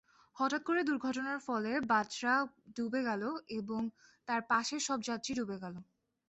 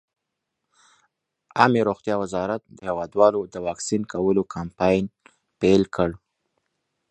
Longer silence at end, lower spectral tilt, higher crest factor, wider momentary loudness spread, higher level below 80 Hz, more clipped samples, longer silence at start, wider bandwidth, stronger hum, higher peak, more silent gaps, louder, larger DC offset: second, 0.45 s vs 0.95 s; second, -3.5 dB/octave vs -6 dB/octave; second, 18 dB vs 24 dB; about the same, 9 LU vs 11 LU; second, -74 dBFS vs -52 dBFS; neither; second, 0.35 s vs 1.55 s; second, 8.2 kHz vs 9.2 kHz; neither; second, -18 dBFS vs 0 dBFS; neither; second, -35 LUFS vs -23 LUFS; neither